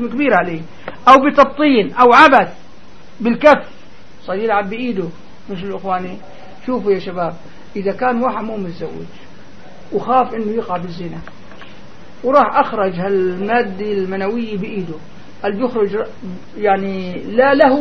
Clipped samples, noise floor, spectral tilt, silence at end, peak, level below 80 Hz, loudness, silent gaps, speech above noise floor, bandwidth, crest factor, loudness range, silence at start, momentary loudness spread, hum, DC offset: 0.1%; -43 dBFS; -6.5 dB/octave; 0 s; 0 dBFS; -50 dBFS; -15 LUFS; none; 28 dB; 11 kHz; 16 dB; 10 LU; 0 s; 19 LU; none; 3%